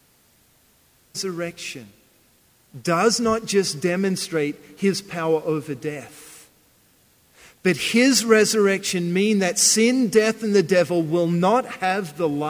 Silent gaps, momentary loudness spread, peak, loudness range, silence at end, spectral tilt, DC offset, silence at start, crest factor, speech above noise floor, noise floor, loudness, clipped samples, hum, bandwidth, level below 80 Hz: none; 14 LU; -4 dBFS; 9 LU; 0 s; -4 dB/octave; under 0.1%; 1.15 s; 18 dB; 38 dB; -59 dBFS; -20 LUFS; under 0.1%; none; 16 kHz; -62 dBFS